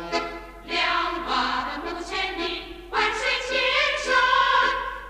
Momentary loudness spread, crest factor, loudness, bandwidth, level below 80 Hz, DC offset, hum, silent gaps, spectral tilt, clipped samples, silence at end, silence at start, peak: 11 LU; 14 dB; -23 LUFS; 15 kHz; -46 dBFS; under 0.1%; none; none; -2 dB/octave; under 0.1%; 0 s; 0 s; -10 dBFS